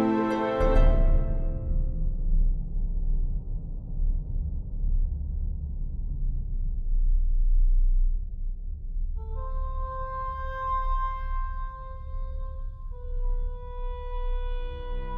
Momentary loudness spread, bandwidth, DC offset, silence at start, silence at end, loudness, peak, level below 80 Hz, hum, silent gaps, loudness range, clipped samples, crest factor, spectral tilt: 12 LU; 3.9 kHz; under 0.1%; 0 s; 0 s; -32 LUFS; -10 dBFS; -26 dBFS; none; none; 7 LU; under 0.1%; 16 dB; -9 dB/octave